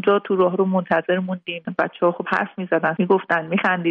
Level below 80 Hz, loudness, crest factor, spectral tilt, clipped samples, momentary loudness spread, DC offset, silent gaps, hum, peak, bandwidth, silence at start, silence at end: -68 dBFS; -21 LUFS; 16 dB; -8.5 dB/octave; under 0.1%; 6 LU; under 0.1%; none; none; -4 dBFS; 6 kHz; 0 s; 0 s